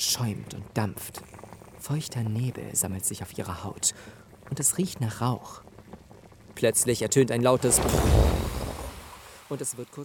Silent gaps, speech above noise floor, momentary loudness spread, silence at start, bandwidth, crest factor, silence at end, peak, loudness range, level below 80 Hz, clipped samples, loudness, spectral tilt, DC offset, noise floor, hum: none; 24 dB; 22 LU; 0 s; 19.5 kHz; 20 dB; 0 s; -6 dBFS; 6 LU; -38 dBFS; under 0.1%; -26 LUFS; -4 dB/octave; under 0.1%; -51 dBFS; none